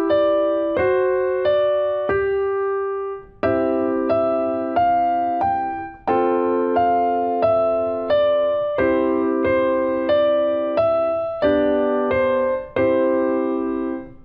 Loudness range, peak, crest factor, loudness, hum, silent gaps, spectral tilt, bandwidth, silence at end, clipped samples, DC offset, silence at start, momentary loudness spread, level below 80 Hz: 2 LU; -8 dBFS; 12 dB; -20 LUFS; none; none; -9 dB/octave; 5.2 kHz; 0 s; under 0.1%; under 0.1%; 0 s; 4 LU; -48 dBFS